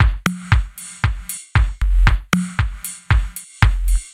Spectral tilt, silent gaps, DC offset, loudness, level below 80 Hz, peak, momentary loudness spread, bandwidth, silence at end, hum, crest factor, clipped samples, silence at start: -4.5 dB/octave; none; under 0.1%; -20 LUFS; -20 dBFS; 0 dBFS; 8 LU; 16 kHz; 0.05 s; none; 18 dB; under 0.1%; 0 s